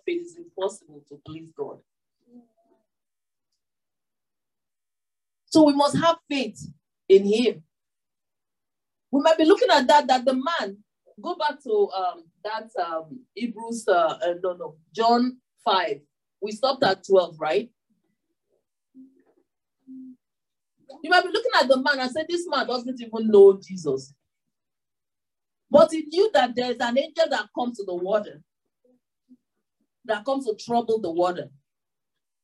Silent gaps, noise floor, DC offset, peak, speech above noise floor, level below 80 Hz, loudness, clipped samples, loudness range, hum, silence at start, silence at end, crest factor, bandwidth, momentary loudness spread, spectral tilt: none; under -90 dBFS; under 0.1%; -4 dBFS; over 68 dB; -74 dBFS; -22 LUFS; under 0.1%; 8 LU; none; 0.05 s; 0.95 s; 20 dB; 11.5 kHz; 18 LU; -4.5 dB/octave